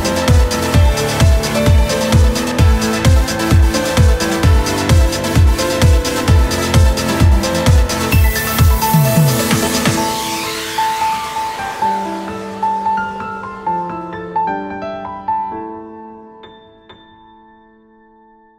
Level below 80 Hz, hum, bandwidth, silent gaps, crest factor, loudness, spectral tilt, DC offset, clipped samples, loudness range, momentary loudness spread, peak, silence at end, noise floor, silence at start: -18 dBFS; none; 16.5 kHz; none; 14 dB; -14 LUFS; -5 dB/octave; under 0.1%; under 0.1%; 11 LU; 11 LU; 0 dBFS; 1.65 s; -47 dBFS; 0 s